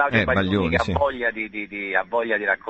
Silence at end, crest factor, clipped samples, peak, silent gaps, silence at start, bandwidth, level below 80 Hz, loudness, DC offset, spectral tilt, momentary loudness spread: 0 s; 16 dB; under 0.1%; -6 dBFS; none; 0 s; 8.4 kHz; -40 dBFS; -22 LUFS; under 0.1%; -6.5 dB/octave; 8 LU